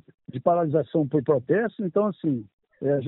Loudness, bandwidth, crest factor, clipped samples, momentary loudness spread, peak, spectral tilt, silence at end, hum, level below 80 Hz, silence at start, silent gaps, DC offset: -25 LUFS; 4 kHz; 18 dB; under 0.1%; 7 LU; -6 dBFS; -8.5 dB/octave; 0 s; none; -66 dBFS; 0.3 s; 2.53-2.58 s; under 0.1%